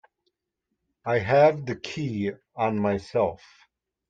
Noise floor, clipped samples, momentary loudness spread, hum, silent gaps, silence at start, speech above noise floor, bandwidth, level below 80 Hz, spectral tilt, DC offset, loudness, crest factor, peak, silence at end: -82 dBFS; under 0.1%; 13 LU; none; none; 1.05 s; 57 dB; 7.8 kHz; -64 dBFS; -7 dB/octave; under 0.1%; -25 LUFS; 20 dB; -8 dBFS; 0.75 s